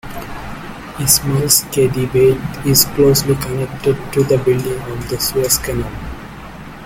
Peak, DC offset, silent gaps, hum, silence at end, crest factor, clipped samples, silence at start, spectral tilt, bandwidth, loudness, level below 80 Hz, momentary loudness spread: 0 dBFS; under 0.1%; none; none; 0 s; 16 dB; under 0.1%; 0.05 s; -4 dB/octave; 17 kHz; -15 LUFS; -36 dBFS; 18 LU